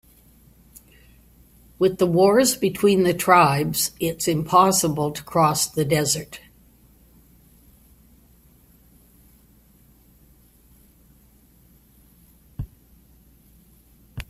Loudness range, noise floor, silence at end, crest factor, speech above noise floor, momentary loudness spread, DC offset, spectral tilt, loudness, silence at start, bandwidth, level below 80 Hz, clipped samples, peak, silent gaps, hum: 9 LU; -55 dBFS; 0.05 s; 24 dB; 36 dB; 22 LU; under 0.1%; -4.5 dB/octave; -19 LUFS; 1.8 s; 16 kHz; -52 dBFS; under 0.1%; 0 dBFS; none; none